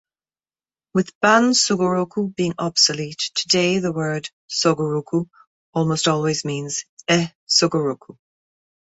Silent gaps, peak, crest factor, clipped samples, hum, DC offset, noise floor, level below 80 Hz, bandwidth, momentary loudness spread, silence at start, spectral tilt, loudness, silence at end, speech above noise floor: 1.15-1.21 s, 4.33-4.48 s, 5.47-5.73 s, 6.89-6.97 s, 7.35-7.47 s; -2 dBFS; 20 dB; under 0.1%; none; under 0.1%; under -90 dBFS; -62 dBFS; 8.4 kHz; 10 LU; 0.95 s; -3.5 dB/octave; -20 LUFS; 0.7 s; over 70 dB